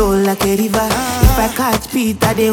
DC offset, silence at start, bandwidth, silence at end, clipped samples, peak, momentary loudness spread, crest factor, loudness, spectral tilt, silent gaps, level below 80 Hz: under 0.1%; 0 s; 20 kHz; 0 s; under 0.1%; 0 dBFS; 3 LU; 14 dB; -15 LUFS; -5 dB/octave; none; -22 dBFS